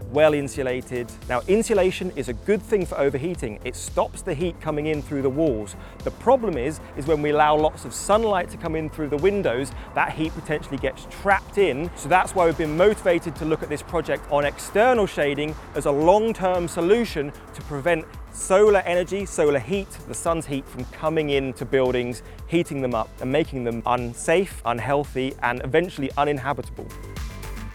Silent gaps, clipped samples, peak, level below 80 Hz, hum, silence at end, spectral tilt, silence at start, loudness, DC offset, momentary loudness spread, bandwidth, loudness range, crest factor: none; under 0.1%; -2 dBFS; -42 dBFS; none; 0 s; -5.5 dB/octave; 0 s; -23 LUFS; under 0.1%; 12 LU; 16.5 kHz; 3 LU; 20 dB